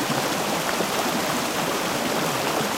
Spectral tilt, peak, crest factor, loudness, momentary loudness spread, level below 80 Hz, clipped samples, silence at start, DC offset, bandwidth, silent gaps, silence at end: -3 dB/octave; -8 dBFS; 16 dB; -23 LUFS; 1 LU; -56 dBFS; under 0.1%; 0 s; under 0.1%; 16 kHz; none; 0 s